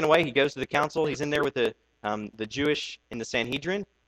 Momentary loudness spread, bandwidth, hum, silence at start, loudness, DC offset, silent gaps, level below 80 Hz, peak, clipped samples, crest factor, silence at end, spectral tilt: 9 LU; 15 kHz; none; 0 s; -28 LUFS; under 0.1%; none; -58 dBFS; -8 dBFS; under 0.1%; 20 dB; 0.25 s; -4.5 dB/octave